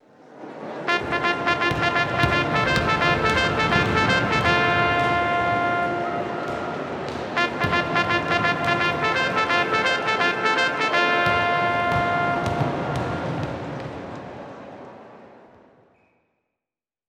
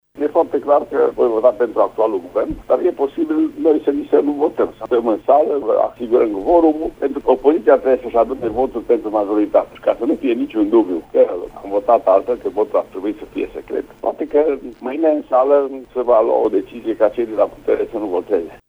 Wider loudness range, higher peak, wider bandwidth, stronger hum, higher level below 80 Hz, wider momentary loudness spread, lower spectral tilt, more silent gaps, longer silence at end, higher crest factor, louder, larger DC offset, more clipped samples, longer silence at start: first, 10 LU vs 3 LU; about the same, -2 dBFS vs 0 dBFS; first, 14 kHz vs 5.8 kHz; neither; about the same, -46 dBFS vs -48 dBFS; first, 13 LU vs 9 LU; second, -5 dB/octave vs -7.5 dB/octave; neither; first, 1.7 s vs 0.15 s; first, 22 dB vs 16 dB; second, -21 LUFS vs -17 LUFS; neither; neither; first, 0.3 s vs 0.15 s